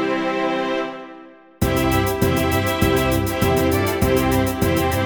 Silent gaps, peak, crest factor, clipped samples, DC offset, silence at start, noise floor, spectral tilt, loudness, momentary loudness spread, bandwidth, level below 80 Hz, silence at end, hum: none; -4 dBFS; 16 dB; under 0.1%; under 0.1%; 0 s; -42 dBFS; -5.5 dB/octave; -19 LUFS; 6 LU; 17.5 kHz; -32 dBFS; 0 s; none